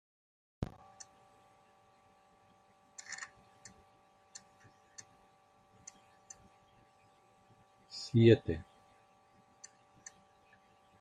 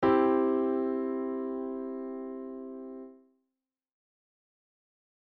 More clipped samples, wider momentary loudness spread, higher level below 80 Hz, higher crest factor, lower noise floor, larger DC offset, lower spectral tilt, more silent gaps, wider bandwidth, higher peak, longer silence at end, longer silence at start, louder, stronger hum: neither; first, 29 LU vs 18 LU; about the same, -66 dBFS vs -66 dBFS; first, 28 dB vs 20 dB; second, -67 dBFS vs -88 dBFS; neither; about the same, -6.5 dB/octave vs -5.5 dB/octave; neither; first, 9.4 kHz vs 4.7 kHz; about the same, -12 dBFS vs -14 dBFS; first, 2.4 s vs 2.15 s; first, 0.6 s vs 0 s; about the same, -33 LUFS vs -31 LUFS; neither